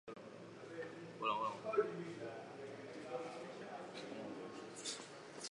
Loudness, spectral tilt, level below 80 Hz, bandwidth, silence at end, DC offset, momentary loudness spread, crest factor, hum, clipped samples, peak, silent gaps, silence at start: -46 LUFS; -3.5 dB/octave; -86 dBFS; 11 kHz; 0 s; under 0.1%; 13 LU; 22 dB; none; under 0.1%; -24 dBFS; none; 0.05 s